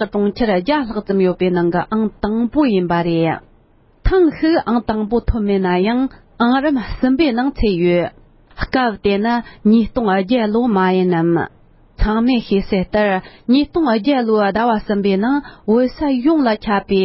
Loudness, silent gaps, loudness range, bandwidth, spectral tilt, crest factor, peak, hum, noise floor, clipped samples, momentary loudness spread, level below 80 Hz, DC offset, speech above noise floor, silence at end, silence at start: -17 LUFS; none; 1 LU; 5.8 kHz; -11.5 dB/octave; 16 dB; 0 dBFS; none; -51 dBFS; under 0.1%; 5 LU; -32 dBFS; under 0.1%; 36 dB; 0 s; 0 s